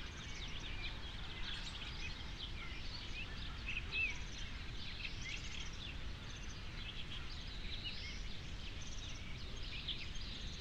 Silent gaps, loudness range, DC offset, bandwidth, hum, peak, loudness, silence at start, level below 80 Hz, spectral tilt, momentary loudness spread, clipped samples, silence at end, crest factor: none; 4 LU; under 0.1%; 10.5 kHz; none; -28 dBFS; -46 LUFS; 0 s; -50 dBFS; -3 dB/octave; 5 LU; under 0.1%; 0 s; 16 dB